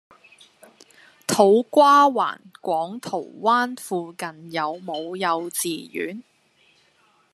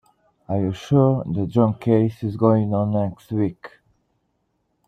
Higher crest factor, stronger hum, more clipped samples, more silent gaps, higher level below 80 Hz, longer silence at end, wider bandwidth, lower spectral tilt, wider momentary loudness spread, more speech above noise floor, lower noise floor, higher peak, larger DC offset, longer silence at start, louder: about the same, 20 dB vs 18 dB; neither; neither; neither; second, -76 dBFS vs -56 dBFS; about the same, 1.1 s vs 1.2 s; first, 14 kHz vs 7.6 kHz; second, -3.5 dB/octave vs -9.5 dB/octave; first, 16 LU vs 7 LU; second, 40 dB vs 51 dB; second, -61 dBFS vs -71 dBFS; about the same, -2 dBFS vs -2 dBFS; neither; first, 1.3 s vs 0.5 s; about the same, -21 LUFS vs -21 LUFS